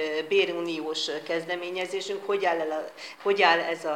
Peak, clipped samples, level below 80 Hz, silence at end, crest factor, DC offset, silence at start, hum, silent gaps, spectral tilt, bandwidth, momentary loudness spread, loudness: -6 dBFS; under 0.1%; -90 dBFS; 0 s; 22 dB; under 0.1%; 0 s; none; none; -3 dB/octave; 15.5 kHz; 10 LU; -27 LUFS